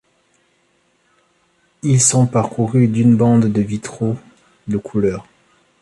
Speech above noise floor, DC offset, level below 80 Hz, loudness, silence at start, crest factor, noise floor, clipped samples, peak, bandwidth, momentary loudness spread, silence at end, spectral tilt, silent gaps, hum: 46 dB; under 0.1%; -50 dBFS; -16 LUFS; 1.85 s; 18 dB; -61 dBFS; under 0.1%; 0 dBFS; 11.5 kHz; 12 LU; 0.6 s; -6 dB/octave; none; none